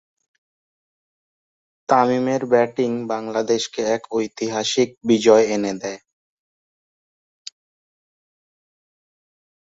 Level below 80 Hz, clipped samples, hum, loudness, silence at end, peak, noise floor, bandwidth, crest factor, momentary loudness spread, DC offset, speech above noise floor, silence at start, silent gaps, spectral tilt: -66 dBFS; under 0.1%; none; -20 LUFS; 3.8 s; -2 dBFS; under -90 dBFS; 8 kHz; 20 dB; 22 LU; under 0.1%; over 71 dB; 1.9 s; 4.97-5.01 s; -4.5 dB/octave